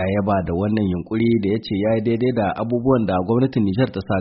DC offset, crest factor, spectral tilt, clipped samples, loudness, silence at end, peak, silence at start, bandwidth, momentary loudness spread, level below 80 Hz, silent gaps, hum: under 0.1%; 14 dB; -7 dB/octave; under 0.1%; -20 LUFS; 0 s; -4 dBFS; 0 s; 5.8 kHz; 3 LU; -46 dBFS; none; none